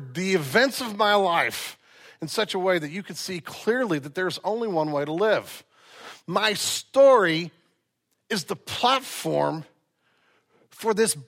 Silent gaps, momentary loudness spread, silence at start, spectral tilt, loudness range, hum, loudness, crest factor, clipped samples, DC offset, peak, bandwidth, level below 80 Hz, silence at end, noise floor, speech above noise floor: none; 13 LU; 0 s; -3.5 dB/octave; 5 LU; none; -24 LUFS; 18 dB; under 0.1%; under 0.1%; -6 dBFS; 16.5 kHz; -72 dBFS; 0 s; -75 dBFS; 51 dB